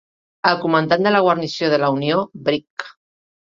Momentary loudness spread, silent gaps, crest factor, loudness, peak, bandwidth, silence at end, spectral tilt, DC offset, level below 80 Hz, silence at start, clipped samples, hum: 11 LU; 2.70-2.77 s; 20 dB; -18 LUFS; 0 dBFS; 7.6 kHz; 0.6 s; -6 dB/octave; under 0.1%; -62 dBFS; 0.45 s; under 0.1%; none